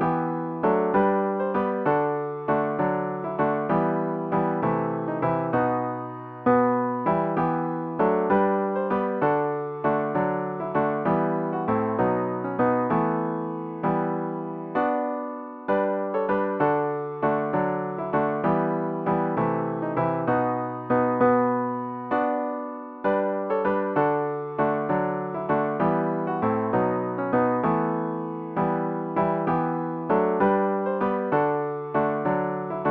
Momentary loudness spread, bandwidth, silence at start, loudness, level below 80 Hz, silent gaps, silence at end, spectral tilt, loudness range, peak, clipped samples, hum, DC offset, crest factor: 7 LU; 5 kHz; 0 s; -25 LUFS; -60 dBFS; none; 0 s; -11 dB/octave; 2 LU; -8 dBFS; under 0.1%; none; under 0.1%; 16 dB